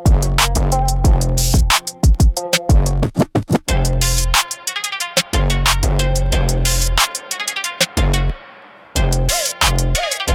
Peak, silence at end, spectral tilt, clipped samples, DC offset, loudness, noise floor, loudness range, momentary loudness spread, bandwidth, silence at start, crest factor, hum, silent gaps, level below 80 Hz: 0 dBFS; 0 s; -3.5 dB/octave; under 0.1%; under 0.1%; -17 LUFS; -41 dBFS; 2 LU; 6 LU; 18 kHz; 0 s; 14 dB; none; none; -18 dBFS